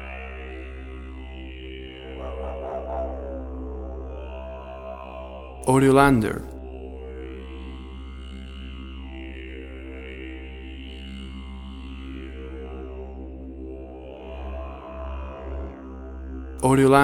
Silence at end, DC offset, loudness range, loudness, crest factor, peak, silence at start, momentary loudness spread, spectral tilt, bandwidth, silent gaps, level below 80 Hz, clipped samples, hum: 0 s; under 0.1%; 14 LU; -29 LUFS; 26 dB; -2 dBFS; 0 s; 17 LU; -6.5 dB/octave; 16 kHz; none; -38 dBFS; under 0.1%; none